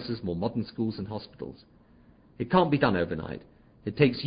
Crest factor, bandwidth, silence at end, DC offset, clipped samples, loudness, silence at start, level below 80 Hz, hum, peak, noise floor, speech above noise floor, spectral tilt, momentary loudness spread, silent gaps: 22 dB; 5.2 kHz; 0 s; under 0.1%; under 0.1%; -28 LUFS; 0 s; -54 dBFS; none; -8 dBFS; -57 dBFS; 29 dB; -11 dB/octave; 18 LU; none